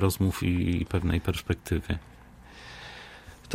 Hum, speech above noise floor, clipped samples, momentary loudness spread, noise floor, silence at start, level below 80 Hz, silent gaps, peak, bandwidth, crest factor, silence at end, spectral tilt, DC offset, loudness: none; 22 dB; under 0.1%; 20 LU; -50 dBFS; 0 s; -42 dBFS; none; -10 dBFS; 16 kHz; 20 dB; 0 s; -6 dB/octave; under 0.1%; -29 LUFS